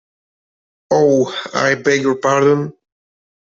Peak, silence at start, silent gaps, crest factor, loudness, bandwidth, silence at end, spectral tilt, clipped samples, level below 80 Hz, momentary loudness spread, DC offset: -2 dBFS; 0.9 s; none; 14 dB; -15 LUFS; 7.8 kHz; 0.8 s; -5 dB/octave; under 0.1%; -60 dBFS; 6 LU; under 0.1%